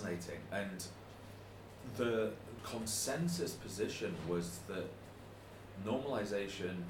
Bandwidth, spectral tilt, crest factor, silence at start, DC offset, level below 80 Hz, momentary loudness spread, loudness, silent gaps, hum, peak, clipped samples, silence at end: 18 kHz; -4.5 dB/octave; 20 dB; 0 s; under 0.1%; -64 dBFS; 17 LU; -40 LUFS; none; none; -22 dBFS; under 0.1%; 0 s